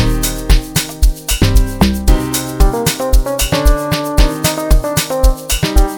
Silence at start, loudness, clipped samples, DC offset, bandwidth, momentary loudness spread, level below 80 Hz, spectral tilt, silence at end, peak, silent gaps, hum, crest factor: 0 s; -15 LUFS; under 0.1%; 0.3%; over 20 kHz; 3 LU; -14 dBFS; -4.5 dB/octave; 0 s; 0 dBFS; none; none; 12 dB